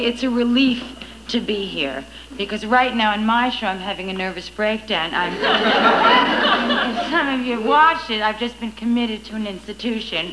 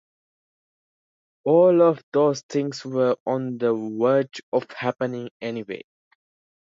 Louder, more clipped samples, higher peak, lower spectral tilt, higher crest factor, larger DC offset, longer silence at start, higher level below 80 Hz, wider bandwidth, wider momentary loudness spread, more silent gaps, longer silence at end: first, -19 LUFS vs -23 LUFS; neither; first, -2 dBFS vs -6 dBFS; second, -4.5 dB/octave vs -6.5 dB/octave; about the same, 18 dB vs 18 dB; first, 0.2% vs under 0.1%; second, 0 s vs 1.45 s; first, -48 dBFS vs -76 dBFS; first, 11 kHz vs 7.6 kHz; about the same, 12 LU vs 14 LU; second, none vs 2.03-2.12 s, 2.43-2.49 s, 3.20-3.26 s, 4.43-4.52 s, 5.31-5.40 s; second, 0 s vs 0.95 s